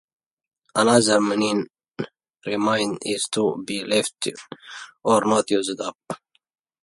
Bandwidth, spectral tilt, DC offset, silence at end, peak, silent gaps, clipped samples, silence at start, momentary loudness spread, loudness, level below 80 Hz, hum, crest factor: 11.5 kHz; -3.5 dB/octave; under 0.1%; 0.65 s; -4 dBFS; 5.95-5.99 s; under 0.1%; 0.75 s; 19 LU; -22 LUFS; -66 dBFS; none; 20 dB